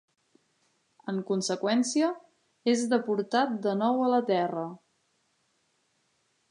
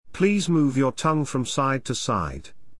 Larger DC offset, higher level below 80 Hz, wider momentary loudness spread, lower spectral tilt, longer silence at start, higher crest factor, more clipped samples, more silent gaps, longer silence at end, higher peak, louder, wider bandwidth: second, under 0.1% vs 0.7%; second, -84 dBFS vs -48 dBFS; first, 10 LU vs 6 LU; about the same, -4.5 dB/octave vs -5.5 dB/octave; first, 1.05 s vs 0.05 s; about the same, 18 dB vs 16 dB; neither; neither; first, 1.75 s vs 0.05 s; about the same, -10 dBFS vs -8 dBFS; second, -28 LUFS vs -23 LUFS; about the same, 11 kHz vs 12 kHz